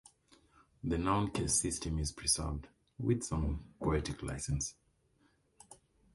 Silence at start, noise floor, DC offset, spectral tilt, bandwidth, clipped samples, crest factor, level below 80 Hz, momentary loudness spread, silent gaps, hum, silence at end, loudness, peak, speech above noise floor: 0.85 s; -72 dBFS; under 0.1%; -4.5 dB/octave; 12 kHz; under 0.1%; 18 dB; -46 dBFS; 9 LU; none; none; 0.4 s; -35 LUFS; -18 dBFS; 37 dB